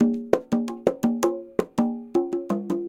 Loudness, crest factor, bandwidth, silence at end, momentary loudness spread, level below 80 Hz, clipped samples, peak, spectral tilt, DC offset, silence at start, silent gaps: -25 LUFS; 22 dB; 16.5 kHz; 0 s; 4 LU; -58 dBFS; under 0.1%; -2 dBFS; -6.5 dB/octave; under 0.1%; 0 s; none